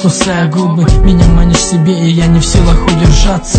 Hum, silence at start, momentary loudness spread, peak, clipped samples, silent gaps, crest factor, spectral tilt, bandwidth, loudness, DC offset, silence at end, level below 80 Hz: none; 0 s; 3 LU; 0 dBFS; 2%; none; 8 dB; -5.5 dB/octave; 9.2 kHz; -9 LUFS; under 0.1%; 0 s; -12 dBFS